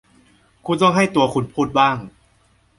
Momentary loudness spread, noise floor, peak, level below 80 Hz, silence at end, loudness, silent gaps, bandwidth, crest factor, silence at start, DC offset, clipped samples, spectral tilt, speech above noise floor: 11 LU; -58 dBFS; -2 dBFS; -54 dBFS; 0.7 s; -18 LUFS; none; 11.5 kHz; 18 dB; 0.65 s; under 0.1%; under 0.1%; -5.5 dB/octave; 41 dB